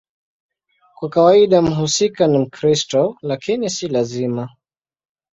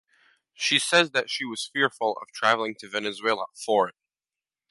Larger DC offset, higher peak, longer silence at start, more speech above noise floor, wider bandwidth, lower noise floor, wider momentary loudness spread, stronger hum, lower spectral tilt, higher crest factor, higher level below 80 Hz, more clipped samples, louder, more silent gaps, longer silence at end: neither; first, -2 dBFS vs -6 dBFS; first, 1 s vs 0.6 s; second, 35 dB vs over 64 dB; second, 8 kHz vs 11.5 kHz; second, -51 dBFS vs under -90 dBFS; about the same, 12 LU vs 10 LU; neither; first, -5 dB/octave vs -2 dB/octave; second, 16 dB vs 22 dB; first, -54 dBFS vs -78 dBFS; neither; first, -17 LUFS vs -25 LUFS; neither; about the same, 0.85 s vs 0.8 s